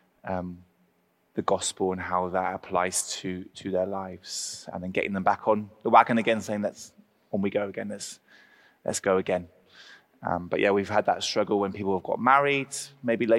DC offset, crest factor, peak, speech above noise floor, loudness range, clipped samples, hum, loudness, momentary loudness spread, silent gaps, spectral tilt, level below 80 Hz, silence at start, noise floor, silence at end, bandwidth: under 0.1%; 24 dB; -4 dBFS; 42 dB; 5 LU; under 0.1%; none; -27 LUFS; 14 LU; none; -4 dB/octave; -66 dBFS; 0.25 s; -69 dBFS; 0 s; 16 kHz